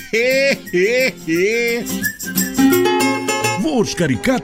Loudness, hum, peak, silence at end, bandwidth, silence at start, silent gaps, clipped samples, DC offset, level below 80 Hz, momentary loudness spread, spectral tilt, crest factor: -16 LUFS; none; -2 dBFS; 0 s; 16.5 kHz; 0 s; none; under 0.1%; under 0.1%; -46 dBFS; 5 LU; -4 dB/octave; 14 dB